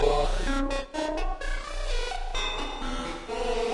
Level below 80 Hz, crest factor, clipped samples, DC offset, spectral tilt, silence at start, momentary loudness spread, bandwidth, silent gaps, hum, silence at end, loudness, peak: -32 dBFS; 16 dB; under 0.1%; under 0.1%; -4 dB/octave; 0 s; 6 LU; 11.5 kHz; none; none; 0 s; -31 LUFS; -12 dBFS